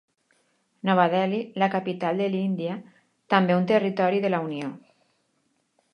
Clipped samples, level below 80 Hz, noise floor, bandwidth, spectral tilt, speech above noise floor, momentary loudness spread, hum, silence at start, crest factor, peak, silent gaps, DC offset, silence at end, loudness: under 0.1%; -76 dBFS; -71 dBFS; 6.6 kHz; -8 dB/octave; 47 dB; 11 LU; none; 0.85 s; 22 dB; -4 dBFS; none; under 0.1%; 1.15 s; -24 LUFS